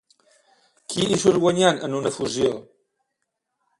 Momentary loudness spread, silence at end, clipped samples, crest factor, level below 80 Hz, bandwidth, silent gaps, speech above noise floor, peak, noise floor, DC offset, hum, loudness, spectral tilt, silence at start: 12 LU; 1.2 s; under 0.1%; 20 dB; -58 dBFS; 11.5 kHz; none; 58 dB; -4 dBFS; -79 dBFS; under 0.1%; none; -21 LUFS; -4.5 dB/octave; 0.9 s